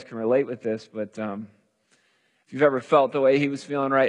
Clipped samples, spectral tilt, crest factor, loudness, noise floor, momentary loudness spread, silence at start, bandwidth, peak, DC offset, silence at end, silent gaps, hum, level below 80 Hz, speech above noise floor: under 0.1%; -6.5 dB/octave; 18 dB; -24 LUFS; -67 dBFS; 13 LU; 0 s; 10 kHz; -6 dBFS; under 0.1%; 0 s; none; none; -80 dBFS; 44 dB